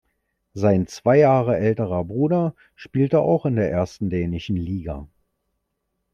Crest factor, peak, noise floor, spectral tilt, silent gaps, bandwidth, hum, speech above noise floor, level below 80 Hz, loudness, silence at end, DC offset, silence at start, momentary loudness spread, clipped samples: 18 dB; -4 dBFS; -76 dBFS; -8.5 dB/octave; none; 9 kHz; none; 56 dB; -48 dBFS; -21 LUFS; 1.1 s; under 0.1%; 0.55 s; 12 LU; under 0.1%